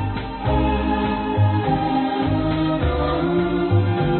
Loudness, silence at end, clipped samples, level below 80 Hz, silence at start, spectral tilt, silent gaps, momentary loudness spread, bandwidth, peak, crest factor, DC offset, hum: -21 LUFS; 0 s; under 0.1%; -30 dBFS; 0 s; -12.5 dB/octave; none; 3 LU; 4.4 kHz; -8 dBFS; 12 dB; under 0.1%; none